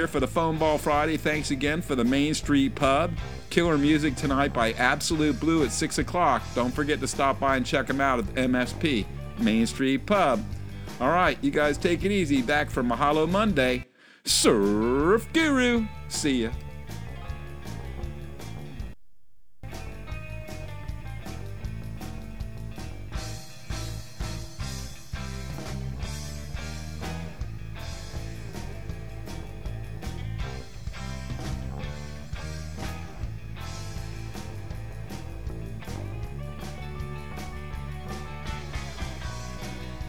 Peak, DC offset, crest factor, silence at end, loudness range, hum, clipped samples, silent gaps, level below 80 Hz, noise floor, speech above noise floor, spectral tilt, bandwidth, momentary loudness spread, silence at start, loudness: -4 dBFS; 0.8%; 24 dB; 0 s; 14 LU; none; under 0.1%; none; -40 dBFS; -67 dBFS; 43 dB; -5 dB/octave; over 20 kHz; 16 LU; 0 s; -27 LUFS